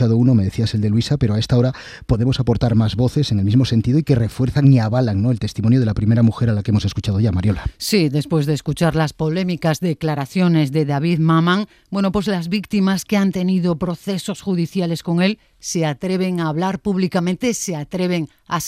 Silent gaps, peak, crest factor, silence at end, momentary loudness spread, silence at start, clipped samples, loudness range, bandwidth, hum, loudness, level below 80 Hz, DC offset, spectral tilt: none; -2 dBFS; 14 dB; 0 s; 6 LU; 0 s; under 0.1%; 4 LU; 15.5 kHz; none; -18 LUFS; -40 dBFS; under 0.1%; -6.5 dB/octave